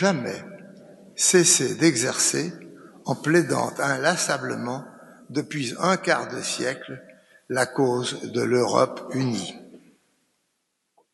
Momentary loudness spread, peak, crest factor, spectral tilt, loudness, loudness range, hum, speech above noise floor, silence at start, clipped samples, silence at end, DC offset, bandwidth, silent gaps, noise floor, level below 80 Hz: 17 LU; -4 dBFS; 20 dB; -3.5 dB/octave; -23 LUFS; 6 LU; none; 52 dB; 0 s; under 0.1%; 1.35 s; under 0.1%; 12 kHz; none; -75 dBFS; -72 dBFS